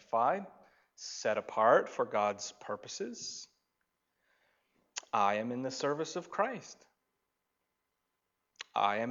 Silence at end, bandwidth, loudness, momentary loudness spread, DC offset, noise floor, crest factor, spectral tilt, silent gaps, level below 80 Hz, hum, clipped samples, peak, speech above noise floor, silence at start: 0 s; 7.8 kHz; -33 LUFS; 17 LU; under 0.1%; -84 dBFS; 22 dB; -3.5 dB/octave; none; -86 dBFS; none; under 0.1%; -14 dBFS; 51 dB; 0.1 s